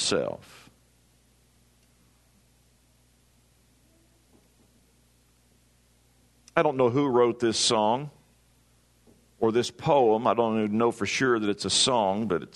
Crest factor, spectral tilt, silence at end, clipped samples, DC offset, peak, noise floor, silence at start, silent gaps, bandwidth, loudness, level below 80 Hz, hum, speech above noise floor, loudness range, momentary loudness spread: 24 dB; -4 dB/octave; 0.1 s; under 0.1%; under 0.1%; -4 dBFS; -63 dBFS; 0 s; none; 12 kHz; -24 LUFS; -66 dBFS; 60 Hz at -55 dBFS; 39 dB; 8 LU; 7 LU